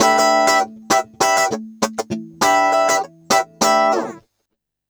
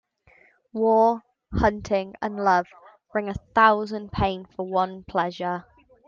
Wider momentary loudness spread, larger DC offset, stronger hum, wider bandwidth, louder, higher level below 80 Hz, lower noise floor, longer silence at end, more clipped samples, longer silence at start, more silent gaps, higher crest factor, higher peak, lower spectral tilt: second, 9 LU vs 14 LU; neither; neither; first, over 20 kHz vs 7.4 kHz; first, -17 LUFS vs -24 LUFS; second, -60 dBFS vs -44 dBFS; first, -75 dBFS vs -58 dBFS; first, 0.7 s vs 0.45 s; neither; second, 0 s vs 0.75 s; neither; about the same, 16 dB vs 20 dB; first, 0 dBFS vs -4 dBFS; second, -2 dB/octave vs -6.5 dB/octave